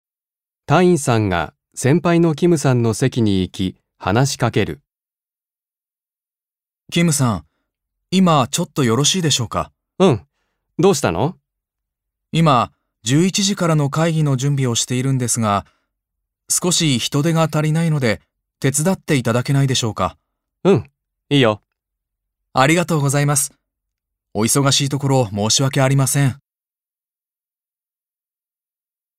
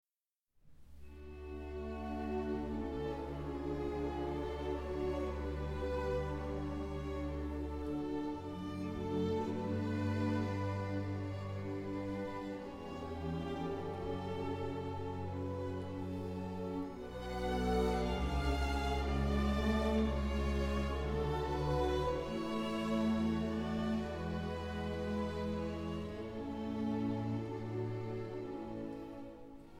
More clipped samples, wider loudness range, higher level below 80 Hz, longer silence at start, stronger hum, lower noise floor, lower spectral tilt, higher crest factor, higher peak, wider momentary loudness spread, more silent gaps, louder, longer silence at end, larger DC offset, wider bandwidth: neither; about the same, 5 LU vs 6 LU; second, -52 dBFS vs -46 dBFS; about the same, 0.7 s vs 0.65 s; neither; about the same, under -90 dBFS vs under -90 dBFS; second, -4.5 dB/octave vs -7.5 dB/octave; about the same, 18 dB vs 16 dB; first, 0 dBFS vs -22 dBFS; about the same, 9 LU vs 9 LU; neither; first, -17 LUFS vs -39 LUFS; first, 2.85 s vs 0 s; neither; first, 16 kHz vs 14.5 kHz